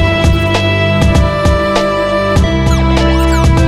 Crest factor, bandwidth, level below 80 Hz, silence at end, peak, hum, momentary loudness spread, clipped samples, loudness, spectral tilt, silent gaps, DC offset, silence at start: 10 dB; 15 kHz; -16 dBFS; 0 s; 0 dBFS; none; 2 LU; under 0.1%; -11 LUFS; -6 dB/octave; none; under 0.1%; 0 s